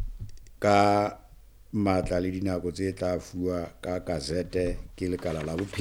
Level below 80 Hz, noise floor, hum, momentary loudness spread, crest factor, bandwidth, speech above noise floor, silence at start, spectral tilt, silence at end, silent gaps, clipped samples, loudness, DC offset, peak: -44 dBFS; -51 dBFS; none; 11 LU; 20 dB; 18.5 kHz; 24 dB; 0 s; -6 dB/octave; 0 s; none; under 0.1%; -28 LUFS; under 0.1%; -8 dBFS